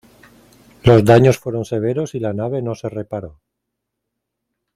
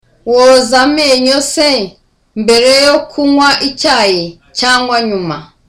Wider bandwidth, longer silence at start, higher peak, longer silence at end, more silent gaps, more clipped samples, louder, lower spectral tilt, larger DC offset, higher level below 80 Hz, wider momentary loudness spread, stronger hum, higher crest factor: second, 14.5 kHz vs 16 kHz; first, 0.85 s vs 0.25 s; about the same, 0 dBFS vs 0 dBFS; first, 1.45 s vs 0.25 s; neither; neither; second, -17 LUFS vs -9 LUFS; first, -7.5 dB/octave vs -2.5 dB/octave; neither; about the same, -48 dBFS vs -44 dBFS; first, 16 LU vs 10 LU; neither; first, 18 dB vs 10 dB